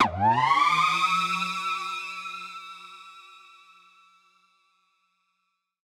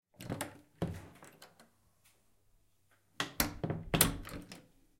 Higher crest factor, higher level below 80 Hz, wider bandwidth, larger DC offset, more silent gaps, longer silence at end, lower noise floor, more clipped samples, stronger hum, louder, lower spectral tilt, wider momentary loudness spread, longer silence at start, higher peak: second, 22 dB vs 32 dB; second, -64 dBFS vs -54 dBFS; about the same, 17 kHz vs 16.5 kHz; neither; neither; first, 2.45 s vs 0.4 s; first, -78 dBFS vs -73 dBFS; neither; neither; first, -24 LUFS vs -36 LUFS; about the same, -3 dB/octave vs -3.5 dB/octave; second, 22 LU vs 25 LU; second, 0 s vs 0.2 s; about the same, -8 dBFS vs -8 dBFS